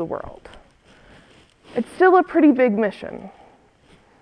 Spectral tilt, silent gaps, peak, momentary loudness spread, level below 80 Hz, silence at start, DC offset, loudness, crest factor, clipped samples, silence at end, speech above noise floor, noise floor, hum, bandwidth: -7.5 dB/octave; none; -4 dBFS; 20 LU; -54 dBFS; 0 s; under 0.1%; -18 LUFS; 18 dB; under 0.1%; 0.95 s; 35 dB; -54 dBFS; none; 10.5 kHz